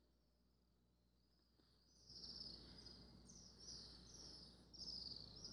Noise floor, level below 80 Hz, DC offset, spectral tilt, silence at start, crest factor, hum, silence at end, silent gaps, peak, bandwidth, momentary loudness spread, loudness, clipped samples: -80 dBFS; -72 dBFS; under 0.1%; -2.5 dB/octave; 0 s; 20 dB; none; 0 s; none; -40 dBFS; 11.5 kHz; 11 LU; -56 LUFS; under 0.1%